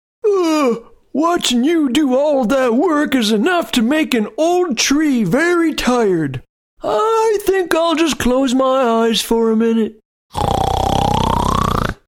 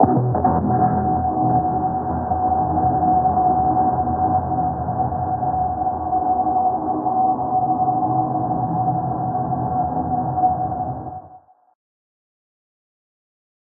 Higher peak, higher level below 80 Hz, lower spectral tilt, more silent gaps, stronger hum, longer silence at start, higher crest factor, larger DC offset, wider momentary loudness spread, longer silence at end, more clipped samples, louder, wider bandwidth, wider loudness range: about the same, 0 dBFS vs -2 dBFS; first, -34 dBFS vs -44 dBFS; second, -4.5 dB/octave vs -14 dB/octave; first, 6.49-6.77 s, 10.05-10.29 s vs none; neither; first, 0.25 s vs 0 s; about the same, 16 dB vs 18 dB; neither; about the same, 5 LU vs 5 LU; second, 0.15 s vs 2.25 s; neither; first, -15 LUFS vs -20 LUFS; first, 19 kHz vs 2 kHz; second, 1 LU vs 6 LU